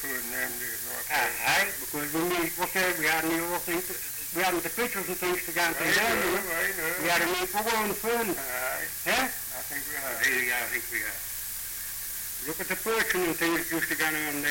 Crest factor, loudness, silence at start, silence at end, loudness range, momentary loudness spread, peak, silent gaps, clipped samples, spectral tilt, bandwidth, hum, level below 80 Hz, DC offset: 16 dB; -27 LUFS; 0 s; 0 s; 3 LU; 8 LU; -14 dBFS; none; under 0.1%; -2 dB/octave; 17 kHz; none; -56 dBFS; under 0.1%